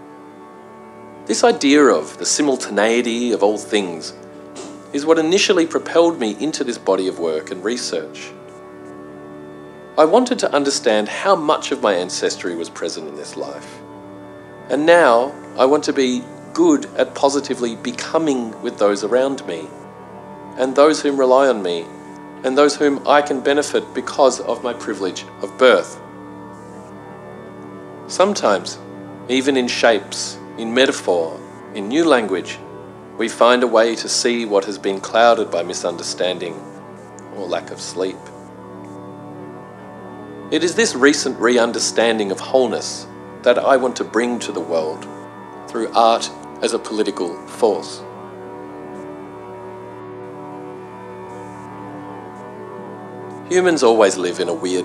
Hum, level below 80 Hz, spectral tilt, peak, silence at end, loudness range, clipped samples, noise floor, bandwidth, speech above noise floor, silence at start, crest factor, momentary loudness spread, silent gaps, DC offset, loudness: none; -62 dBFS; -3 dB/octave; 0 dBFS; 0 s; 10 LU; under 0.1%; -39 dBFS; 12.5 kHz; 22 dB; 0 s; 18 dB; 22 LU; none; under 0.1%; -17 LUFS